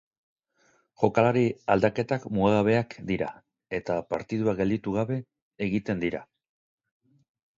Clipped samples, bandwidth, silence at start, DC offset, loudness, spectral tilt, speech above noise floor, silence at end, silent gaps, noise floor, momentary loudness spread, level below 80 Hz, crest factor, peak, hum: under 0.1%; 7.6 kHz; 1 s; under 0.1%; -27 LUFS; -8 dB/octave; 41 dB; 1.35 s; 5.42-5.51 s; -67 dBFS; 11 LU; -56 dBFS; 22 dB; -6 dBFS; none